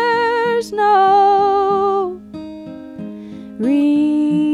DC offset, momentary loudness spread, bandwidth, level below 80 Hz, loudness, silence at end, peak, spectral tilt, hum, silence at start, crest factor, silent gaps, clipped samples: under 0.1%; 20 LU; 11.5 kHz; -56 dBFS; -15 LUFS; 0 s; -4 dBFS; -6 dB/octave; none; 0 s; 12 dB; none; under 0.1%